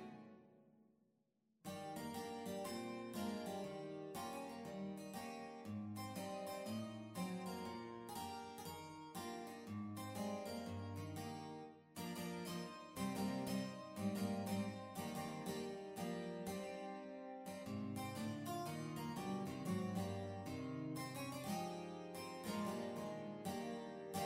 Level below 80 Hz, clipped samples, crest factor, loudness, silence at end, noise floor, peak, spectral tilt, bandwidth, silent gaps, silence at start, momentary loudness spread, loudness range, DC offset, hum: -78 dBFS; under 0.1%; 16 dB; -47 LUFS; 0 s; -82 dBFS; -30 dBFS; -5.5 dB/octave; 16 kHz; none; 0 s; 8 LU; 4 LU; under 0.1%; none